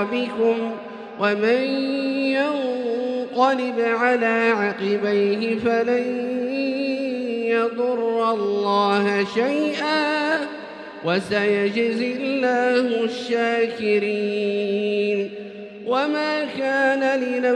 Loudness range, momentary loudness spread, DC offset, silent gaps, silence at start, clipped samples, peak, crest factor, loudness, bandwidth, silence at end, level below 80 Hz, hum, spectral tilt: 2 LU; 6 LU; under 0.1%; none; 0 s; under 0.1%; -6 dBFS; 16 dB; -21 LUFS; 10 kHz; 0 s; -68 dBFS; none; -5.5 dB/octave